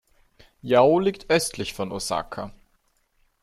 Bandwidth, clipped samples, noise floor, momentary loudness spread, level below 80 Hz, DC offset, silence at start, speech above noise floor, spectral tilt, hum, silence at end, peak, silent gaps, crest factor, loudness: 14.5 kHz; under 0.1%; -67 dBFS; 18 LU; -54 dBFS; under 0.1%; 0.65 s; 45 dB; -4.5 dB/octave; none; 0.9 s; -4 dBFS; none; 20 dB; -23 LUFS